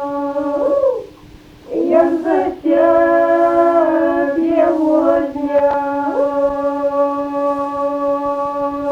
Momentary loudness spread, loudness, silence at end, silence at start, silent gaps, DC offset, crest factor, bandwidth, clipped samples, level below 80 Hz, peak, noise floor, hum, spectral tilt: 7 LU; -16 LUFS; 0 s; 0 s; none; under 0.1%; 14 dB; 7.6 kHz; under 0.1%; -48 dBFS; 0 dBFS; -40 dBFS; none; -7 dB/octave